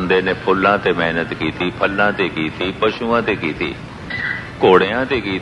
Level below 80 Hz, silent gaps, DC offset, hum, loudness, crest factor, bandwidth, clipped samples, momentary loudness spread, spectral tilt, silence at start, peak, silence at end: -44 dBFS; none; under 0.1%; none; -17 LUFS; 18 dB; 11 kHz; under 0.1%; 10 LU; -6.5 dB/octave; 0 s; 0 dBFS; 0 s